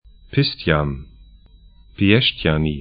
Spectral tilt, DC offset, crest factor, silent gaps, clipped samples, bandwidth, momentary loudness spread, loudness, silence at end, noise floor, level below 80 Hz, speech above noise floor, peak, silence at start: -11 dB/octave; under 0.1%; 20 dB; none; under 0.1%; 5.2 kHz; 10 LU; -19 LUFS; 0 s; -47 dBFS; -36 dBFS; 29 dB; 0 dBFS; 0.3 s